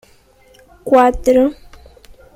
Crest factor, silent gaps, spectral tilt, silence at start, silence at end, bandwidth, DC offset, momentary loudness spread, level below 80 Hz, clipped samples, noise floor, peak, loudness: 16 dB; none; -5.5 dB/octave; 0.85 s; 0.85 s; 15 kHz; under 0.1%; 9 LU; -36 dBFS; under 0.1%; -49 dBFS; 0 dBFS; -13 LUFS